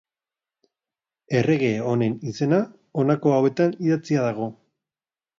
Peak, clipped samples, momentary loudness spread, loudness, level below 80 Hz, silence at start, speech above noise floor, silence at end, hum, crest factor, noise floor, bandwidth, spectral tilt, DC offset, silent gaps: -6 dBFS; under 0.1%; 7 LU; -23 LUFS; -66 dBFS; 1.3 s; over 69 dB; 0.85 s; none; 18 dB; under -90 dBFS; 7.6 kHz; -7.5 dB/octave; under 0.1%; none